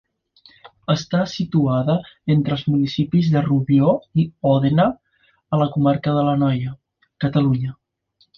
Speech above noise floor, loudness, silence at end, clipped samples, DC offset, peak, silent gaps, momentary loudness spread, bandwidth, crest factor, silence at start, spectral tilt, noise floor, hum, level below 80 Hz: 44 dB; -19 LUFS; 0.65 s; under 0.1%; under 0.1%; -4 dBFS; none; 7 LU; 6.8 kHz; 16 dB; 0.65 s; -8 dB/octave; -63 dBFS; none; -52 dBFS